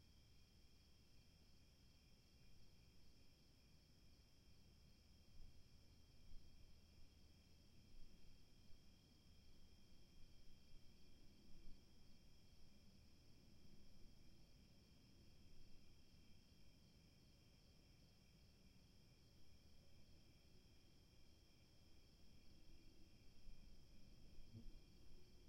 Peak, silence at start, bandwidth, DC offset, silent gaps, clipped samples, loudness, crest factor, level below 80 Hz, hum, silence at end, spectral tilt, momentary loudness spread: -44 dBFS; 0 s; 16 kHz; under 0.1%; none; under 0.1%; -68 LUFS; 18 dB; -70 dBFS; none; 0 s; -4.5 dB/octave; 5 LU